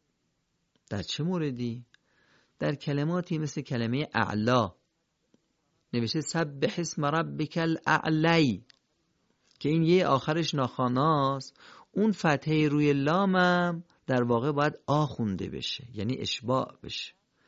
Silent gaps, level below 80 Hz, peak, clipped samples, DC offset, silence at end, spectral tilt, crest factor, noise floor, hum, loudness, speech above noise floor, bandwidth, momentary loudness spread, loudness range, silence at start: none; -60 dBFS; -10 dBFS; under 0.1%; under 0.1%; 0.4 s; -6 dB/octave; 20 dB; -76 dBFS; none; -28 LUFS; 49 dB; 8 kHz; 11 LU; 5 LU; 0.9 s